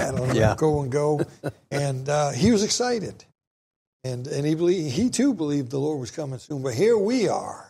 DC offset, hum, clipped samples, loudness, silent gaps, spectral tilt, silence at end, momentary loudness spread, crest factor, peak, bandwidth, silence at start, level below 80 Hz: under 0.1%; none; under 0.1%; -24 LUFS; 3.47-4.00 s; -5.5 dB/octave; 0.05 s; 12 LU; 18 dB; -6 dBFS; 15 kHz; 0 s; -48 dBFS